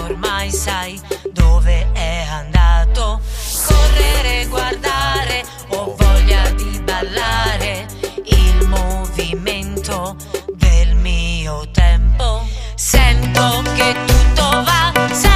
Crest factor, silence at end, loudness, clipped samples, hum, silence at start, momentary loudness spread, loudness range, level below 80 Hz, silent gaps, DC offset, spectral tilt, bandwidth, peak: 14 dB; 0 s; -16 LUFS; under 0.1%; none; 0 s; 10 LU; 4 LU; -16 dBFS; none; under 0.1%; -4 dB/octave; 15.5 kHz; 0 dBFS